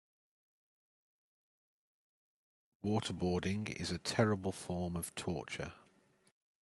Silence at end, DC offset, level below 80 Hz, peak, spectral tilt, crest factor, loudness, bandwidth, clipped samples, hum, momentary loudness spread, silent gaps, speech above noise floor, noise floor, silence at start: 0.85 s; under 0.1%; -68 dBFS; -14 dBFS; -5 dB/octave; 26 dB; -38 LUFS; 12 kHz; under 0.1%; none; 10 LU; none; 33 dB; -70 dBFS; 2.85 s